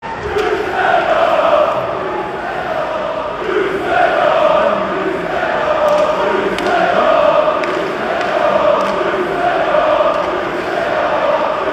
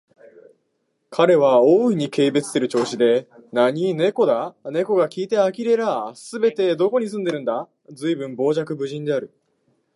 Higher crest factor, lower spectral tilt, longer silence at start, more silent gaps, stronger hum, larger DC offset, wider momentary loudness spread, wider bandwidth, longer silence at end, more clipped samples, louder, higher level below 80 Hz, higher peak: about the same, 14 dB vs 18 dB; about the same, -5 dB/octave vs -6 dB/octave; second, 0 s vs 1.1 s; neither; neither; neither; second, 7 LU vs 11 LU; first, 13.5 kHz vs 11.5 kHz; second, 0 s vs 0.7 s; neither; first, -15 LUFS vs -20 LUFS; first, -44 dBFS vs -76 dBFS; about the same, 0 dBFS vs -2 dBFS